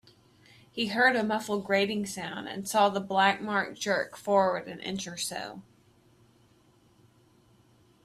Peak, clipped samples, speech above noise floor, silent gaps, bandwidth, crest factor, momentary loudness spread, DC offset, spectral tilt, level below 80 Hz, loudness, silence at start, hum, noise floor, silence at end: -8 dBFS; under 0.1%; 34 dB; none; 15.5 kHz; 22 dB; 12 LU; under 0.1%; -3.5 dB/octave; -70 dBFS; -28 LUFS; 0.75 s; none; -63 dBFS; 2.45 s